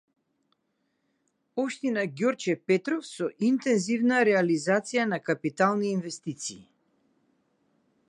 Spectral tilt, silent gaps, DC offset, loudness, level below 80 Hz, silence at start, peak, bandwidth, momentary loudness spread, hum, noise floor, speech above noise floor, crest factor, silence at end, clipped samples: -5 dB/octave; none; under 0.1%; -27 LUFS; -78 dBFS; 1.55 s; -8 dBFS; 11 kHz; 11 LU; none; -76 dBFS; 50 dB; 20 dB; 1.45 s; under 0.1%